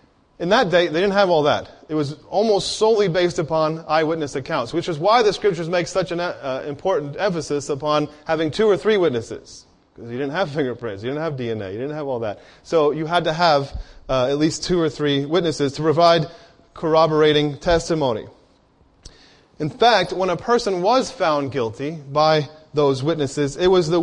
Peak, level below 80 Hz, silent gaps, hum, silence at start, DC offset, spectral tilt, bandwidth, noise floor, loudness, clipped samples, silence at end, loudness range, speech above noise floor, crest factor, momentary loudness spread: -2 dBFS; -46 dBFS; none; none; 0.4 s; under 0.1%; -5 dB/octave; 10.5 kHz; -56 dBFS; -20 LUFS; under 0.1%; 0 s; 4 LU; 37 dB; 18 dB; 11 LU